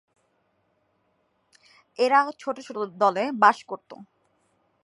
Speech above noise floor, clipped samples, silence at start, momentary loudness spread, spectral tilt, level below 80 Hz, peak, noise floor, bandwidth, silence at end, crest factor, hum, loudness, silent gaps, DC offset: 47 dB; under 0.1%; 2 s; 18 LU; -4.5 dB/octave; -84 dBFS; -4 dBFS; -70 dBFS; 11.5 kHz; 0.8 s; 24 dB; none; -23 LUFS; none; under 0.1%